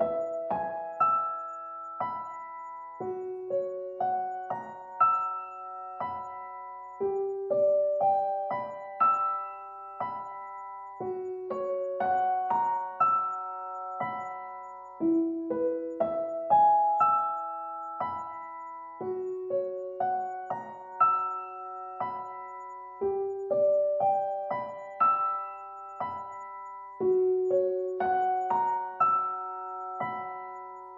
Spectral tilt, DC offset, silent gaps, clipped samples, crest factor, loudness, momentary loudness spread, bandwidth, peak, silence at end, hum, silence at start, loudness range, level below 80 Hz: -8 dB/octave; under 0.1%; none; under 0.1%; 18 dB; -30 LUFS; 16 LU; 7.4 kHz; -12 dBFS; 0 s; none; 0 s; 5 LU; -76 dBFS